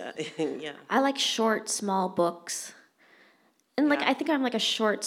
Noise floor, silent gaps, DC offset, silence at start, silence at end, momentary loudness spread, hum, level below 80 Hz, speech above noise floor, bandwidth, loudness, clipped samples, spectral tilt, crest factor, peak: -65 dBFS; none; under 0.1%; 0 s; 0 s; 11 LU; none; -86 dBFS; 38 dB; 16.5 kHz; -27 LUFS; under 0.1%; -3 dB/octave; 20 dB; -8 dBFS